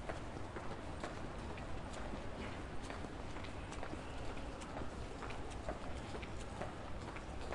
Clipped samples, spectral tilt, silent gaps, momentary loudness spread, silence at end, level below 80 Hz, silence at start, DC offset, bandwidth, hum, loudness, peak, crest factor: under 0.1%; -5.5 dB/octave; none; 1 LU; 0 s; -52 dBFS; 0 s; under 0.1%; 11.5 kHz; none; -47 LUFS; -28 dBFS; 18 dB